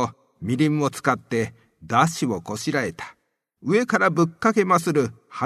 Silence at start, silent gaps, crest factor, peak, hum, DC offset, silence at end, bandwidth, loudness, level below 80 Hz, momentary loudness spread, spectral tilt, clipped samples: 0 s; none; 20 dB; -2 dBFS; none; under 0.1%; 0 s; 13.5 kHz; -22 LUFS; -60 dBFS; 11 LU; -5.5 dB/octave; under 0.1%